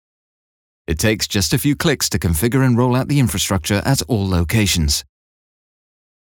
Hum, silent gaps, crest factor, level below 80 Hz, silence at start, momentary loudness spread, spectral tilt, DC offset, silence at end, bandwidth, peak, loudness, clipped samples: none; none; 16 dB; -34 dBFS; 0.9 s; 4 LU; -4.5 dB/octave; under 0.1%; 1.25 s; over 20 kHz; -2 dBFS; -17 LUFS; under 0.1%